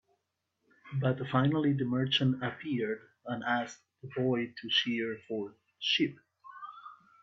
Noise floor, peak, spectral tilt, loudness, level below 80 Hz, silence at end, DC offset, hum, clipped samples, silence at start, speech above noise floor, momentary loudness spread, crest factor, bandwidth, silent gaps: -82 dBFS; -14 dBFS; -6 dB/octave; -32 LUFS; -74 dBFS; 0.25 s; under 0.1%; none; under 0.1%; 0.85 s; 51 dB; 18 LU; 20 dB; 7.6 kHz; none